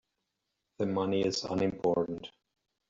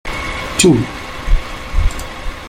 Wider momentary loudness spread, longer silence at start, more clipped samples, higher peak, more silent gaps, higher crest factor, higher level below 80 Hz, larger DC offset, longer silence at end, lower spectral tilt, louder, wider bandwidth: second, 9 LU vs 15 LU; first, 0.8 s vs 0.05 s; neither; second, -16 dBFS vs 0 dBFS; neither; about the same, 16 dB vs 16 dB; second, -66 dBFS vs -20 dBFS; neither; first, 0.6 s vs 0 s; about the same, -5.5 dB/octave vs -4.5 dB/octave; second, -31 LUFS vs -17 LUFS; second, 7.8 kHz vs 16 kHz